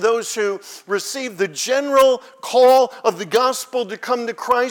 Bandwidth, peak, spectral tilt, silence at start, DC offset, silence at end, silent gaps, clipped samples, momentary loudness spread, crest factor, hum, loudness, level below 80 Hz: 19 kHz; -4 dBFS; -2.5 dB/octave; 0 s; under 0.1%; 0 s; none; under 0.1%; 11 LU; 14 dB; none; -18 LUFS; -64 dBFS